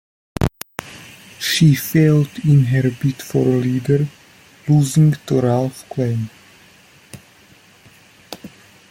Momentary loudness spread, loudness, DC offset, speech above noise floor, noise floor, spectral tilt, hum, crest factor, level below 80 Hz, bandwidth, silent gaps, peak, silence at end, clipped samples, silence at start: 21 LU; -17 LUFS; under 0.1%; 33 dB; -49 dBFS; -6.5 dB/octave; none; 18 dB; -44 dBFS; 16.5 kHz; none; 0 dBFS; 0.45 s; under 0.1%; 0.4 s